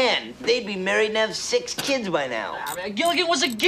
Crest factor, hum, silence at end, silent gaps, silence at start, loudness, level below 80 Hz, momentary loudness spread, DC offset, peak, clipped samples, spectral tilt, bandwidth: 18 dB; none; 0 s; none; 0 s; -23 LUFS; -62 dBFS; 8 LU; under 0.1%; -6 dBFS; under 0.1%; -2.5 dB/octave; 15.5 kHz